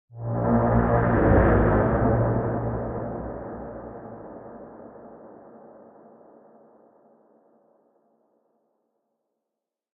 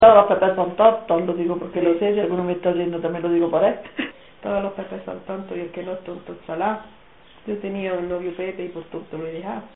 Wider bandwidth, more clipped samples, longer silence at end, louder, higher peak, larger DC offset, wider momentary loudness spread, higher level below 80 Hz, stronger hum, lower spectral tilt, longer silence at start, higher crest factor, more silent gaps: second, 3.4 kHz vs 4 kHz; neither; first, 4.45 s vs 0.05 s; about the same, -23 LUFS vs -22 LUFS; second, -6 dBFS vs 0 dBFS; second, under 0.1% vs 0.2%; first, 25 LU vs 15 LU; first, -36 dBFS vs -56 dBFS; neither; first, -10 dB/octave vs -5 dB/octave; first, 0.15 s vs 0 s; about the same, 20 dB vs 20 dB; neither